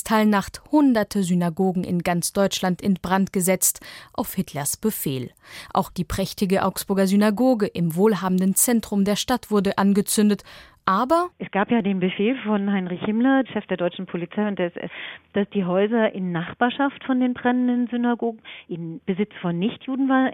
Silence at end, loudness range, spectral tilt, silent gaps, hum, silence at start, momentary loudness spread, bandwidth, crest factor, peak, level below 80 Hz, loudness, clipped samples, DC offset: 0 s; 4 LU; -5 dB/octave; none; none; 0.05 s; 9 LU; 16.5 kHz; 18 dB; -4 dBFS; -52 dBFS; -22 LUFS; under 0.1%; under 0.1%